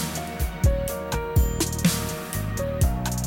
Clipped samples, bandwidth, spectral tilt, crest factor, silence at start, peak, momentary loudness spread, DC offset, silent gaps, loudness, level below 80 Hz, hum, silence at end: under 0.1%; 17 kHz; -5 dB/octave; 14 dB; 0 s; -10 dBFS; 6 LU; under 0.1%; none; -25 LUFS; -28 dBFS; none; 0 s